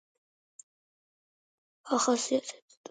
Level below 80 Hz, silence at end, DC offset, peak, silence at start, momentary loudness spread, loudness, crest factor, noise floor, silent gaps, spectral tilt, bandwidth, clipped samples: -88 dBFS; 0.4 s; under 0.1%; -14 dBFS; 1.85 s; 18 LU; -29 LUFS; 20 dB; under -90 dBFS; none; -2 dB/octave; 9.6 kHz; under 0.1%